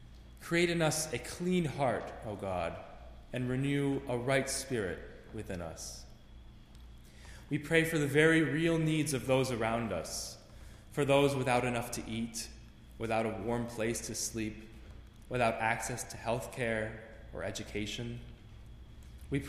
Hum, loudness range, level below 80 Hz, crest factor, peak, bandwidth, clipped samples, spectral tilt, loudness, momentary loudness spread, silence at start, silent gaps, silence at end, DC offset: none; 7 LU; -54 dBFS; 22 dB; -12 dBFS; 15.5 kHz; under 0.1%; -5 dB/octave; -33 LUFS; 22 LU; 0 s; none; 0 s; under 0.1%